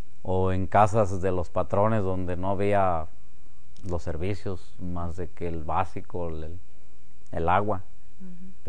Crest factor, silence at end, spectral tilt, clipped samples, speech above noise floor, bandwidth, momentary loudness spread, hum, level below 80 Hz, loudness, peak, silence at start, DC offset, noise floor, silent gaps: 22 dB; 0 s; -8 dB/octave; under 0.1%; 30 dB; 10 kHz; 16 LU; none; -46 dBFS; -28 LUFS; -6 dBFS; 0.25 s; 6%; -57 dBFS; none